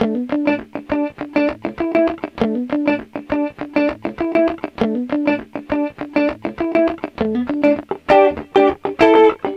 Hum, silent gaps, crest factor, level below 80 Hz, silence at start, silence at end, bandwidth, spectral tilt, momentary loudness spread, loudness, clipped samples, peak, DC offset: none; none; 16 dB; -48 dBFS; 0 s; 0 s; 7.8 kHz; -7 dB/octave; 10 LU; -18 LUFS; under 0.1%; -2 dBFS; under 0.1%